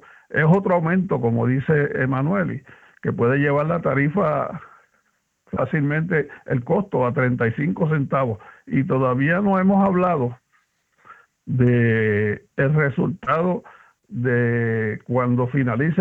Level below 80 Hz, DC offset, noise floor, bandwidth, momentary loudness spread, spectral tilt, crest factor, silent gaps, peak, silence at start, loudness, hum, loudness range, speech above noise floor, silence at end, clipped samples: -54 dBFS; under 0.1%; -68 dBFS; 3.9 kHz; 9 LU; -10.5 dB/octave; 16 dB; none; -6 dBFS; 0.3 s; -21 LUFS; none; 3 LU; 48 dB; 0 s; under 0.1%